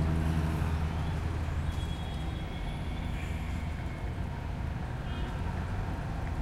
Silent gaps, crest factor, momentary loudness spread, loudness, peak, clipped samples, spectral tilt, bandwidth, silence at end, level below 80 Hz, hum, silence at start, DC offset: none; 14 dB; 6 LU; -35 LUFS; -18 dBFS; under 0.1%; -7 dB/octave; 13.5 kHz; 0 s; -36 dBFS; none; 0 s; under 0.1%